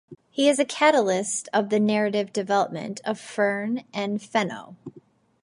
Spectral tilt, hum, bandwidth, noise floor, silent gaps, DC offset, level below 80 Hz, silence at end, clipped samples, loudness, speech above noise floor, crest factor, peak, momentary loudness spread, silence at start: -4 dB/octave; none; 11.5 kHz; -54 dBFS; none; under 0.1%; -76 dBFS; 0.45 s; under 0.1%; -24 LUFS; 30 dB; 20 dB; -4 dBFS; 11 LU; 0.1 s